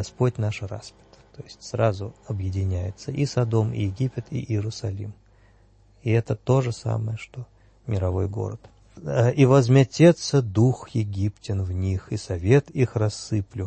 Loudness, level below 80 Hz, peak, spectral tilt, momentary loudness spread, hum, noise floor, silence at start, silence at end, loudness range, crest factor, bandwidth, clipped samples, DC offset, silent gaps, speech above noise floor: -24 LUFS; -50 dBFS; -4 dBFS; -7 dB/octave; 17 LU; none; -56 dBFS; 0 s; 0 s; 7 LU; 20 dB; 8.8 kHz; under 0.1%; under 0.1%; none; 33 dB